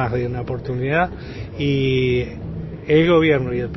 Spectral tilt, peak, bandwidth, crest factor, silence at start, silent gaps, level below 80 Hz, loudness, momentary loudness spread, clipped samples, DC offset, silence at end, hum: -8 dB/octave; -4 dBFS; 6 kHz; 16 dB; 0 s; none; -38 dBFS; -19 LUFS; 16 LU; under 0.1%; under 0.1%; 0 s; none